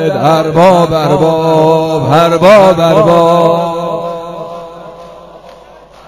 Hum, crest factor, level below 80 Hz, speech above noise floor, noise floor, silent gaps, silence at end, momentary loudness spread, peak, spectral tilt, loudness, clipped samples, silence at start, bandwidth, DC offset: none; 10 dB; -42 dBFS; 29 dB; -36 dBFS; none; 0.55 s; 18 LU; 0 dBFS; -6.5 dB/octave; -8 LUFS; 1%; 0 s; 15.5 kHz; under 0.1%